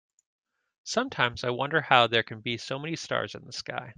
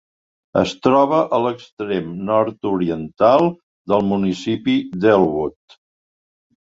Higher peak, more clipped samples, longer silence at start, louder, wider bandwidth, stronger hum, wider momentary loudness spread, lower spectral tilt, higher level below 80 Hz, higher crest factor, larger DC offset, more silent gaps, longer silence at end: about the same, -2 dBFS vs -2 dBFS; neither; first, 0.85 s vs 0.55 s; second, -27 LUFS vs -18 LUFS; first, 10 kHz vs 7.8 kHz; neither; first, 14 LU vs 9 LU; second, -3.5 dB/octave vs -7 dB/octave; second, -66 dBFS vs -52 dBFS; first, 26 dB vs 18 dB; neither; second, none vs 1.72-1.77 s, 3.63-3.85 s; second, 0.05 s vs 1.2 s